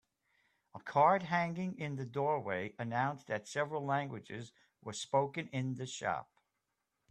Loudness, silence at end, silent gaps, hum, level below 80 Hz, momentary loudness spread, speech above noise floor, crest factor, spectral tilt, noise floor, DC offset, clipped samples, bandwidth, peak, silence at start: -36 LUFS; 0.9 s; none; none; -78 dBFS; 17 LU; 50 dB; 22 dB; -5.5 dB/octave; -86 dBFS; under 0.1%; under 0.1%; 10.5 kHz; -16 dBFS; 0.75 s